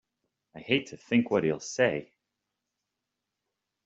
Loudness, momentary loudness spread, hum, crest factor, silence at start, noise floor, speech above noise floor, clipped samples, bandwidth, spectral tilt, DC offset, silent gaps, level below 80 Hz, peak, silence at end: -28 LUFS; 8 LU; none; 24 dB; 0.55 s; -86 dBFS; 58 dB; under 0.1%; 8 kHz; -5 dB/octave; under 0.1%; none; -70 dBFS; -8 dBFS; 1.8 s